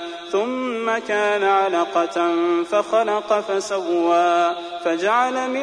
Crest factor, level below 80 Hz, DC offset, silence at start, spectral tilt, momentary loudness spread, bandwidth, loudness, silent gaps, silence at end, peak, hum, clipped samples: 14 dB; -66 dBFS; under 0.1%; 0 s; -3.5 dB/octave; 6 LU; 10.5 kHz; -20 LUFS; none; 0 s; -6 dBFS; none; under 0.1%